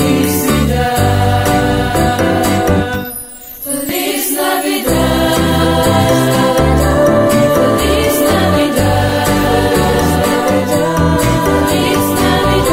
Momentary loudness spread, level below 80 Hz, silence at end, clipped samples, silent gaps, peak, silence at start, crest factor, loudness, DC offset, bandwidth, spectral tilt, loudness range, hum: 4 LU; -24 dBFS; 0 s; under 0.1%; none; 0 dBFS; 0 s; 12 dB; -12 LUFS; under 0.1%; 16.5 kHz; -5 dB/octave; 3 LU; none